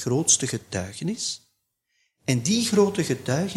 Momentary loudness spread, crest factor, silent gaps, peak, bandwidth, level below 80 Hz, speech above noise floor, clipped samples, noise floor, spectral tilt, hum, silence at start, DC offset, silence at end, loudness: 12 LU; 20 dB; none; -6 dBFS; 15.5 kHz; -60 dBFS; 50 dB; under 0.1%; -74 dBFS; -4 dB/octave; none; 0 s; under 0.1%; 0 s; -24 LUFS